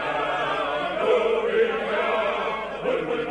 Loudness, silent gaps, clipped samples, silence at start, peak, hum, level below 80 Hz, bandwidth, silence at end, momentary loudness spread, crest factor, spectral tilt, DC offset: -24 LUFS; none; under 0.1%; 0 s; -10 dBFS; none; -54 dBFS; 10 kHz; 0 s; 5 LU; 14 dB; -5 dB/octave; under 0.1%